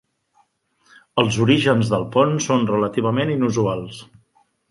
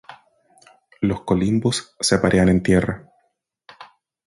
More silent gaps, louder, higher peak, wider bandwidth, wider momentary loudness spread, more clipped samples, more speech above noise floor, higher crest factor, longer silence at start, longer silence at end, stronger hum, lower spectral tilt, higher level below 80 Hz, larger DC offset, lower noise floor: neither; about the same, -19 LUFS vs -19 LUFS; about the same, -2 dBFS vs -2 dBFS; about the same, 11.5 kHz vs 11.5 kHz; about the same, 9 LU vs 9 LU; neither; second, 44 dB vs 51 dB; about the same, 18 dB vs 20 dB; first, 1.15 s vs 0.1 s; first, 0.65 s vs 0.45 s; neither; about the same, -5.5 dB/octave vs -5.5 dB/octave; second, -54 dBFS vs -42 dBFS; neither; second, -62 dBFS vs -70 dBFS